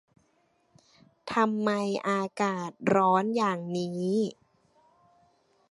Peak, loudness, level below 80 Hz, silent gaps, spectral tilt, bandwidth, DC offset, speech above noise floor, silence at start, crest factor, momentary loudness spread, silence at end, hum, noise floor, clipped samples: -10 dBFS; -28 LUFS; -74 dBFS; none; -6 dB/octave; 11.5 kHz; under 0.1%; 42 dB; 1.25 s; 20 dB; 8 LU; 1.4 s; none; -70 dBFS; under 0.1%